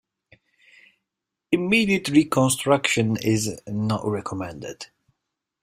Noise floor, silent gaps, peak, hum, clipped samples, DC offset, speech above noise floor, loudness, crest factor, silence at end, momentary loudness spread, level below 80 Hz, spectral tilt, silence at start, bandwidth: -84 dBFS; none; -4 dBFS; none; under 0.1%; under 0.1%; 62 dB; -22 LUFS; 20 dB; 0.75 s; 15 LU; -58 dBFS; -4.5 dB/octave; 1.5 s; 16 kHz